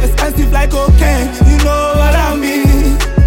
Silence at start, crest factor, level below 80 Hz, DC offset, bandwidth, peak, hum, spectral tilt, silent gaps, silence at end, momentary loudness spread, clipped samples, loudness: 0 s; 8 dB; -12 dBFS; under 0.1%; 17 kHz; 0 dBFS; none; -6 dB/octave; none; 0 s; 4 LU; under 0.1%; -12 LUFS